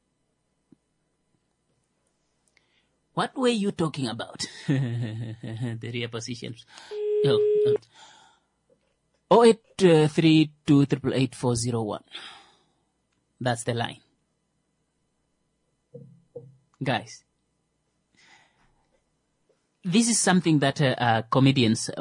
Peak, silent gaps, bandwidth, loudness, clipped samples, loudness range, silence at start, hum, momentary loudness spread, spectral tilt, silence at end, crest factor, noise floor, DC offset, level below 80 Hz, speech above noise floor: -6 dBFS; none; 11 kHz; -24 LUFS; under 0.1%; 15 LU; 3.15 s; none; 16 LU; -5 dB/octave; 0 s; 20 dB; -74 dBFS; under 0.1%; -64 dBFS; 50 dB